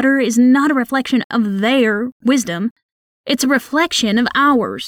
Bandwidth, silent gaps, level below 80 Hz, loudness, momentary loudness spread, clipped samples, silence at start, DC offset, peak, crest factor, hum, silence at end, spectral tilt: 17.5 kHz; 1.24-1.30 s, 2.12-2.20 s, 2.71-2.76 s, 2.83-3.24 s; -56 dBFS; -15 LUFS; 9 LU; under 0.1%; 0 s; under 0.1%; -4 dBFS; 12 dB; none; 0 s; -4 dB/octave